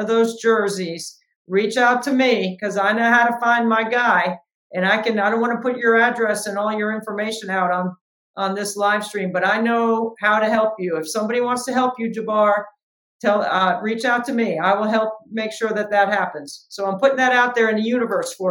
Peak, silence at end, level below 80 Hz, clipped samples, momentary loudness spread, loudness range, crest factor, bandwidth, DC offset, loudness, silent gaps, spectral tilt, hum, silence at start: -2 dBFS; 0 s; -76 dBFS; under 0.1%; 9 LU; 3 LU; 16 dB; 17.5 kHz; under 0.1%; -19 LUFS; 1.36-1.45 s, 4.54-4.70 s, 8.01-8.34 s, 12.83-13.20 s; -4.5 dB/octave; none; 0 s